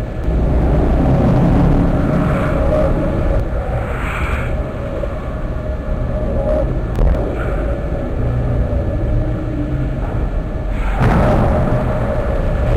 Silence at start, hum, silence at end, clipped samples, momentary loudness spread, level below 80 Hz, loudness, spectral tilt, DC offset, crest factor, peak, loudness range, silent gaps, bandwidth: 0 s; none; 0 s; under 0.1%; 9 LU; -18 dBFS; -18 LUFS; -9 dB/octave; under 0.1%; 10 dB; -4 dBFS; 5 LU; none; 9.4 kHz